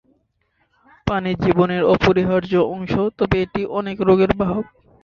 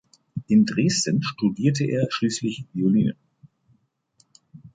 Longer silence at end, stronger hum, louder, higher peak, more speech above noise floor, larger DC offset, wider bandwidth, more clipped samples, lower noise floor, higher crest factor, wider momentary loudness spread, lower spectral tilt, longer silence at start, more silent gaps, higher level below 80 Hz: first, 0.4 s vs 0.05 s; neither; first, -19 LUFS vs -22 LUFS; first, -2 dBFS vs -6 dBFS; first, 48 dB vs 43 dB; neither; second, 6.8 kHz vs 9.4 kHz; neither; about the same, -66 dBFS vs -65 dBFS; about the same, 18 dB vs 18 dB; about the same, 8 LU vs 9 LU; first, -8 dB/octave vs -5.5 dB/octave; first, 1.05 s vs 0.35 s; neither; first, -40 dBFS vs -60 dBFS